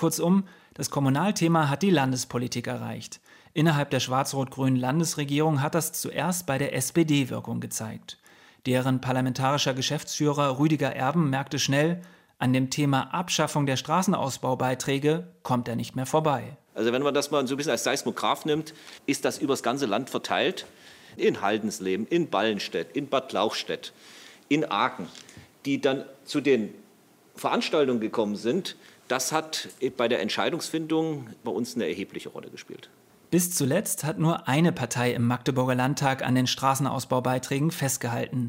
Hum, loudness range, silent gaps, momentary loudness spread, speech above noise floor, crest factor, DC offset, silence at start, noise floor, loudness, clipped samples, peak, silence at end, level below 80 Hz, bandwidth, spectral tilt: none; 3 LU; none; 11 LU; 32 dB; 18 dB; under 0.1%; 0 s; -58 dBFS; -26 LUFS; under 0.1%; -8 dBFS; 0 s; -66 dBFS; 16 kHz; -5 dB/octave